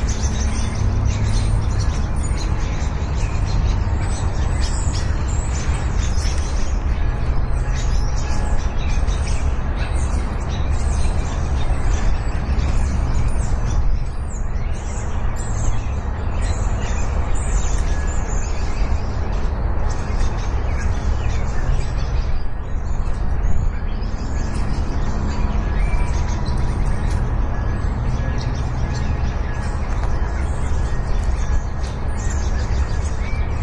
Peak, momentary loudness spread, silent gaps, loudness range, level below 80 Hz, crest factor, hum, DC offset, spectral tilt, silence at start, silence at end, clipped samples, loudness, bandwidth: -6 dBFS; 4 LU; none; 2 LU; -20 dBFS; 12 dB; none; under 0.1%; -5.5 dB/octave; 0 s; 0 s; under 0.1%; -23 LUFS; 9.8 kHz